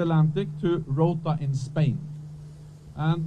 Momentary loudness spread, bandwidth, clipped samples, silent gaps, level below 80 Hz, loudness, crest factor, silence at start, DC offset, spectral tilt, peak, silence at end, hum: 19 LU; 8.6 kHz; under 0.1%; none; -54 dBFS; -26 LUFS; 16 dB; 0 s; under 0.1%; -8.5 dB/octave; -10 dBFS; 0 s; none